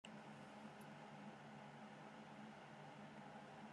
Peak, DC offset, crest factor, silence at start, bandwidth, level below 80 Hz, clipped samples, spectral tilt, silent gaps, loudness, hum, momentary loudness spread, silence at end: -40 dBFS; under 0.1%; 18 dB; 0.05 s; 11.5 kHz; under -90 dBFS; under 0.1%; -5.5 dB/octave; none; -58 LUFS; none; 1 LU; 0 s